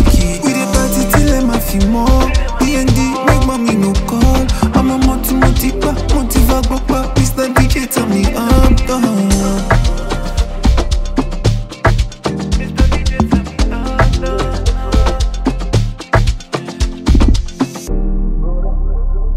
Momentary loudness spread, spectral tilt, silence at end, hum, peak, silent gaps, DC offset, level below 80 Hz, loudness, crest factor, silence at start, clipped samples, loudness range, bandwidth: 7 LU; -5.5 dB/octave; 0 s; none; 0 dBFS; none; under 0.1%; -14 dBFS; -14 LUFS; 12 dB; 0 s; under 0.1%; 3 LU; 16.5 kHz